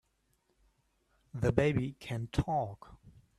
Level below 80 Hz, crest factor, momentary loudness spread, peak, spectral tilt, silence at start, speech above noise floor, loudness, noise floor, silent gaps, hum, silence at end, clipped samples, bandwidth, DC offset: -50 dBFS; 24 dB; 14 LU; -12 dBFS; -7.5 dB/octave; 1.35 s; 43 dB; -33 LUFS; -76 dBFS; none; none; 0.3 s; under 0.1%; 13 kHz; under 0.1%